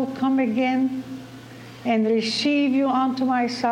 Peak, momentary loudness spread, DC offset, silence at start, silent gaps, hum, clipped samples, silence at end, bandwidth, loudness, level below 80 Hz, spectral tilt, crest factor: -8 dBFS; 17 LU; under 0.1%; 0 s; none; none; under 0.1%; 0 s; 10.5 kHz; -22 LUFS; -66 dBFS; -5 dB/octave; 14 dB